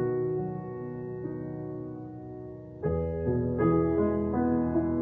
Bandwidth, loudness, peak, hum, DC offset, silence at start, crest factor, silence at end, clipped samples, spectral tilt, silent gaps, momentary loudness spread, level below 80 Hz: 3.1 kHz; -30 LUFS; -14 dBFS; none; under 0.1%; 0 s; 16 dB; 0 s; under 0.1%; -12.5 dB/octave; none; 16 LU; -46 dBFS